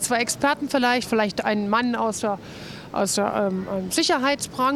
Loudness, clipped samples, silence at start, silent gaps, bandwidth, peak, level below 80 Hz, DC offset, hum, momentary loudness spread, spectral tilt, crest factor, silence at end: -23 LUFS; under 0.1%; 0 s; none; 16.5 kHz; -8 dBFS; -58 dBFS; under 0.1%; none; 7 LU; -3.5 dB/octave; 16 dB; 0 s